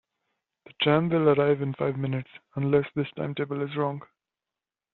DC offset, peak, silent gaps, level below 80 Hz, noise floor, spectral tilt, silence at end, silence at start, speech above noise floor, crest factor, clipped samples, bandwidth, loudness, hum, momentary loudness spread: under 0.1%; -6 dBFS; none; -64 dBFS; under -90 dBFS; -5.5 dB/octave; 0.95 s; 0.8 s; over 64 dB; 20 dB; under 0.1%; 4.3 kHz; -26 LUFS; none; 10 LU